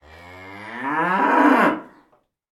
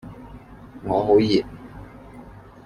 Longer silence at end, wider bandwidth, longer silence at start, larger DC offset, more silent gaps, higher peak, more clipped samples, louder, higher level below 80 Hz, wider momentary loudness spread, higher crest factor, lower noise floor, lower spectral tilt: first, 0.7 s vs 0.35 s; first, 13.5 kHz vs 10 kHz; first, 0.25 s vs 0.05 s; neither; neither; about the same, -4 dBFS vs -6 dBFS; neither; about the same, -18 LUFS vs -20 LUFS; second, -62 dBFS vs -48 dBFS; second, 22 LU vs 26 LU; about the same, 18 dB vs 18 dB; first, -61 dBFS vs -43 dBFS; about the same, -6 dB/octave vs -7 dB/octave